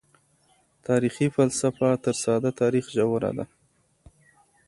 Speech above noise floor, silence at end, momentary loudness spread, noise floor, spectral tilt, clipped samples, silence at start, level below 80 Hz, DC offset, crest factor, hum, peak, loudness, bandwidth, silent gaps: 43 dB; 1.25 s; 8 LU; -66 dBFS; -6 dB/octave; under 0.1%; 0.9 s; -60 dBFS; under 0.1%; 18 dB; none; -8 dBFS; -25 LUFS; 11.5 kHz; none